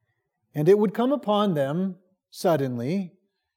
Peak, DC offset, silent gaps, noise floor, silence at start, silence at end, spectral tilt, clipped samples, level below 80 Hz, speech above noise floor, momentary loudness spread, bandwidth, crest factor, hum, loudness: -8 dBFS; under 0.1%; none; -75 dBFS; 0.55 s; 0.5 s; -7 dB/octave; under 0.1%; -84 dBFS; 52 dB; 11 LU; 17 kHz; 16 dB; none; -24 LUFS